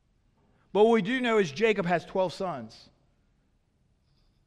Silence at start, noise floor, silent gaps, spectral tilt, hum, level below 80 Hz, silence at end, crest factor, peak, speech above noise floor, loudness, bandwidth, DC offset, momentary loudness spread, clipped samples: 0.75 s; -69 dBFS; none; -6 dB/octave; none; -64 dBFS; 1.8 s; 20 dB; -10 dBFS; 43 dB; -26 LUFS; 9.8 kHz; under 0.1%; 12 LU; under 0.1%